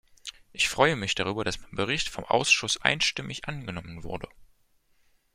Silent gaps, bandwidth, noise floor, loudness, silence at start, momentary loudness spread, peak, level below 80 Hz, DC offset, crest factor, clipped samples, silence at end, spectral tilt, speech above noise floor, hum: none; 16 kHz; -66 dBFS; -26 LUFS; 0.25 s; 17 LU; -2 dBFS; -52 dBFS; under 0.1%; 28 dB; under 0.1%; 0.9 s; -2.5 dB/octave; 38 dB; none